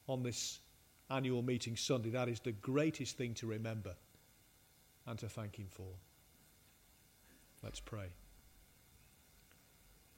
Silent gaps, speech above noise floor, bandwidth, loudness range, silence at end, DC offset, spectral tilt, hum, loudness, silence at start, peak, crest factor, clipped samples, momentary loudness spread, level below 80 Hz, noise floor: none; 28 dB; 16 kHz; 16 LU; 0.25 s; under 0.1%; -5 dB/octave; none; -42 LUFS; 0.05 s; -24 dBFS; 20 dB; under 0.1%; 16 LU; -68 dBFS; -68 dBFS